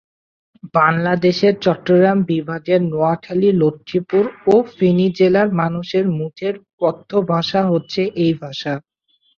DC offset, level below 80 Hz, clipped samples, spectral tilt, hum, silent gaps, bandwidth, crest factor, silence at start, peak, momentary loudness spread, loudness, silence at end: under 0.1%; -58 dBFS; under 0.1%; -7.5 dB/octave; none; 6.73-6.78 s; 7 kHz; 16 dB; 0.65 s; -2 dBFS; 9 LU; -17 LUFS; 0.6 s